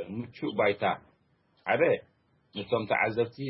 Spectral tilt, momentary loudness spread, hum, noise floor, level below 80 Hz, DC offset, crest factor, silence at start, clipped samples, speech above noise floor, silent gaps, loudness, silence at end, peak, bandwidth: -9.5 dB/octave; 13 LU; none; -68 dBFS; -68 dBFS; under 0.1%; 18 dB; 0 s; under 0.1%; 40 dB; none; -29 LUFS; 0 s; -12 dBFS; 5.8 kHz